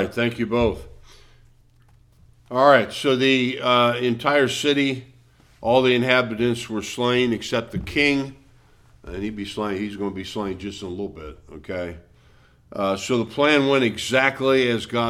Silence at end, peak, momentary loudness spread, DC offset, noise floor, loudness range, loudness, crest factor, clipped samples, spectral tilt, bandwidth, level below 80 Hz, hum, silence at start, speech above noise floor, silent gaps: 0 s; -2 dBFS; 14 LU; under 0.1%; -54 dBFS; 11 LU; -21 LUFS; 20 dB; under 0.1%; -5 dB/octave; 15 kHz; -48 dBFS; none; 0 s; 33 dB; none